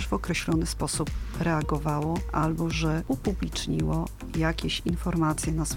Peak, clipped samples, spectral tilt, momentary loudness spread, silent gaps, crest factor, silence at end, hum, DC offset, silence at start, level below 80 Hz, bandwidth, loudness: -12 dBFS; under 0.1%; -5 dB/octave; 4 LU; none; 16 dB; 0 s; none; under 0.1%; 0 s; -36 dBFS; 16.5 kHz; -28 LUFS